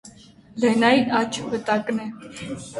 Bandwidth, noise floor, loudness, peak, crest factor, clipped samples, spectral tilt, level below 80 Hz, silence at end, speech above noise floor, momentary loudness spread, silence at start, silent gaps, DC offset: 11.5 kHz; -48 dBFS; -21 LUFS; -2 dBFS; 20 dB; under 0.1%; -4.5 dB/octave; -58 dBFS; 0 s; 26 dB; 18 LU; 0.05 s; none; under 0.1%